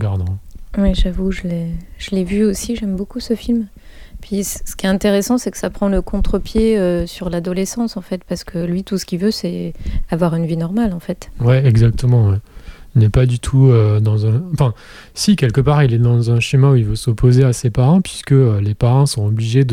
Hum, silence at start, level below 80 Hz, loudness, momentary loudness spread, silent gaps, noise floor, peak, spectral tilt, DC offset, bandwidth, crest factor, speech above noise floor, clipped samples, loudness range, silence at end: none; 0 s; -28 dBFS; -16 LUFS; 11 LU; none; -34 dBFS; -2 dBFS; -7 dB/octave; under 0.1%; 16 kHz; 14 dB; 19 dB; under 0.1%; 7 LU; 0 s